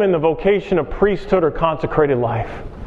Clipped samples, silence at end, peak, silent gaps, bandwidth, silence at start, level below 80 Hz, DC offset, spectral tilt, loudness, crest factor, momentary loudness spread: under 0.1%; 0 s; -2 dBFS; none; 7.2 kHz; 0 s; -34 dBFS; under 0.1%; -8.5 dB/octave; -18 LUFS; 16 dB; 5 LU